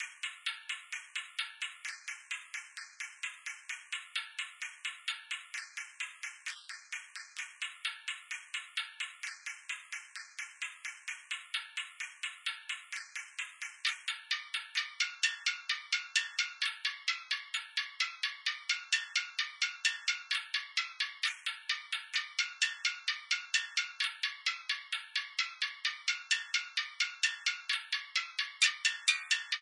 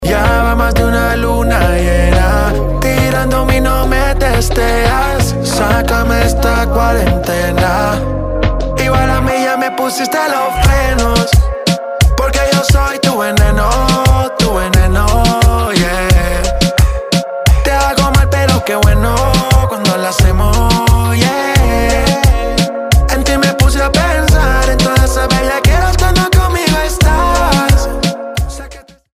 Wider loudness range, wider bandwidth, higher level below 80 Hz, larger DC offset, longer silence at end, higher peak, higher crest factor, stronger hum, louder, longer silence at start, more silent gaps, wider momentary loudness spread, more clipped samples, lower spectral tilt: first, 7 LU vs 2 LU; second, 11.5 kHz vs 16 kHz; second, under -90 dBFS vs -14 dBFS; neither; second, 0 s vs 0.35 s; second, -12 dBFS vs 0 dBFS; first, 26 dB vs 10 dB; neither; second, -35 LUFS vs -12 LUFS; about the same, 0 s vs 0 s; neither; first, 11 LU vs 4 LU; neither; second, 11 dB/octave vs -5 dB/octave